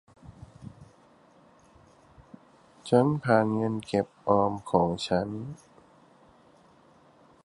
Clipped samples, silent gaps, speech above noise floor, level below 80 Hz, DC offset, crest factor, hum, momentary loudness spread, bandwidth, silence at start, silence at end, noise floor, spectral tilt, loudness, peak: under 0.1%; none; 33 dB; -58 dBFS; under 0.1%; 22 dB; none; 24 LU; 11.5 kHz; 0.25 s; 1.9 s; -59 dBFS; -7 dB/octave; -27 LUFS; -8 dBFS